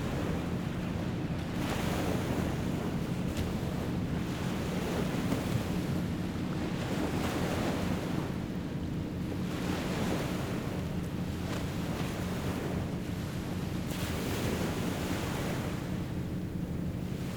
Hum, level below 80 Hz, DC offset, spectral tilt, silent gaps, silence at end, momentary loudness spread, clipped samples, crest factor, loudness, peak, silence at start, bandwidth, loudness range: none; -46 dBFS; under 0.1%; -6 dB/octave; none; 0 s; 4 LU; under 0.1%; 16 dB; -34 LUFS; -18 dBFS; 0 s; over 20 kHz; 2 LU